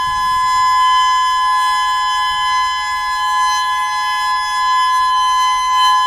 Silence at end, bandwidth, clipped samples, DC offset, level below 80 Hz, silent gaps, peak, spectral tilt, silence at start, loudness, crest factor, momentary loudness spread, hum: 0 s; 16 kHz; under 0.1%; under 0.1%; -44 dBFS; none; -4 dBFS; 2 dB/octave; 0 s; -14 LUFS; 10 dB; 4 LU; none